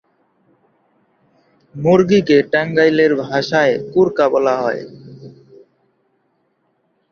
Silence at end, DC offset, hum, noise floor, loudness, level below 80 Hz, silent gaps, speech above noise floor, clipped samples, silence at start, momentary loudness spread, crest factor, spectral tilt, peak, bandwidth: 1.8 s; under 0.1%; none; -64 dBFS; -15 LUFS; -58 dBFS; none; 50 dB; under 0.1%; 1.75 s; 12 LU; 16 dB; -6.5 dB/octave; -2 dBFS; 7 kHz